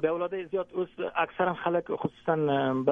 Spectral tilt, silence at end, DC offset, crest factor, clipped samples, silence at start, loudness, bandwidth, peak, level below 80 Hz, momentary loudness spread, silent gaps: -8.5 dB/octave; 0 s; under 0.1%; 18 dB; under 0.1%; 0 s; -29 LUFS; 3.8 kHz; -10 dBFS; -68 dBFS; 6 LU; none